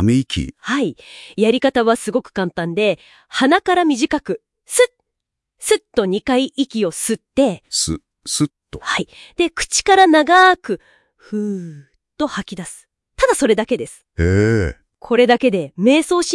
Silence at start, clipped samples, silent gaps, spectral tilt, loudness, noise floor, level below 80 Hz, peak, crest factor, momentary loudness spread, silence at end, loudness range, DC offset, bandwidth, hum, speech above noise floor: 0 s; under 0.1%; none; -4 dB/octave; -17 LUFS; -80 dBFS; -44 dBFS; 0 dBFS; 18 dB; 14 LU; 0 s; 5 LU; under 0.1%; 12 kHz; none; 63 dB